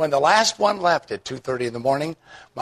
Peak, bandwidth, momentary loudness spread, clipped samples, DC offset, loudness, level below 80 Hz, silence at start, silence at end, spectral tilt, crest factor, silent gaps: -4 dBFS; 13.5 kHz; 14 LU; under 0.1%; under 0.1%; -21 LUFS; -62 dBFS; 0 s; 0 s; -3 dB/octave; 18 dB; none